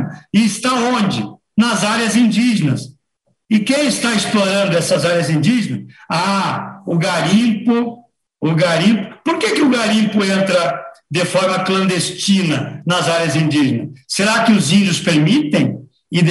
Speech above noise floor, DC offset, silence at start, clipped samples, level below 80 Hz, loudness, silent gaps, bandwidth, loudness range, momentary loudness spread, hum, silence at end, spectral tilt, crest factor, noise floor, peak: 52 dB; under 0.1%; 0 s; under 0.1%; -58 dBFS; -15 LUFS; none; 12.5 kHz; 2 LU; 8 LU; none; 0 s; -5 dB/octave; 14 dB; -66 dBFS; -2 dBFS